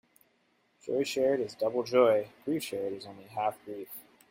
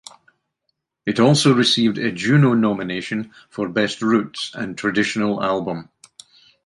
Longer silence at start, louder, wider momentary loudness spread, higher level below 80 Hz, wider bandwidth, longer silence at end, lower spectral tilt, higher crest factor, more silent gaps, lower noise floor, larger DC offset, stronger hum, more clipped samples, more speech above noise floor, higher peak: second, 0.85 s vs 1.05 s; second, -30 LUFS vs -19 LUFS; first, 18 LU vs 13 LU; second, -76 dBFS vs -60 dBFS; first, 16.5 kHz vs 11.5 kHz; second, 0.3 s vs 0.85 s; about the same, -5 dB/octave vs -5 dB/octave; about the same, 20 dB vs 18 dB; neither; about the same, -71 dBFS vs -74 dBFS; neither; neither; neither; second, 41 dB vs 56 dB; second, -12 dBFS vs -2 dBFS